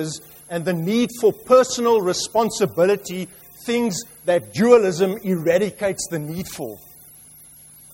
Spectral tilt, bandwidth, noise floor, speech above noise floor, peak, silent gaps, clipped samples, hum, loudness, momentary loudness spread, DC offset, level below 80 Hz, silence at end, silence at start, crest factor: -4.5 dB/octave; 16.5 kHz; -46 dBFS; 26 dB; -2 dBFS; none; under 0.1%; none; -20 LUFS; 16 LU; under 0.1%; -58 dBFS; 1.15 s; 0 s; 20 dB